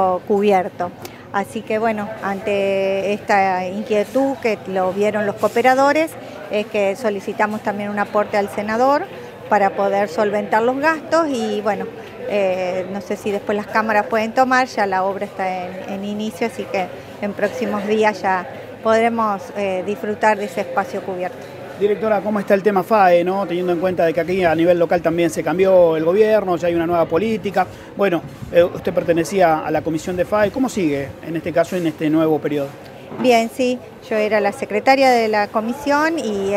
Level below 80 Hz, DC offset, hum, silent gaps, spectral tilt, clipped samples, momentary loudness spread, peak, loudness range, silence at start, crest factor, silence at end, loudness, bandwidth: -54 dBFS; under 0.1%; none; none; -5.5 dB/octave; under 0.1%; 10 LU; 0 dBFS; 4 LU; 0 s; 18 dB; 0 s; -19 LUFS; 16 kHz